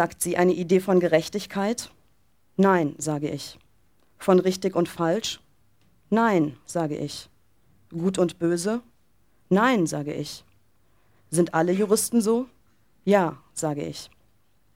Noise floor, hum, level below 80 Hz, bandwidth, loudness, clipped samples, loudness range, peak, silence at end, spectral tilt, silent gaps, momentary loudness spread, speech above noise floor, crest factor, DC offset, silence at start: -67 dBFS; none; -62 dBFS; 16.5 kHz; -24 LUFS; under 0.1%; 3 LU; -6 dBFS; 0.7 s; -5 dB/octave; none; 14 LU; 44 dB; 20 dB; under 0.1%; 0 s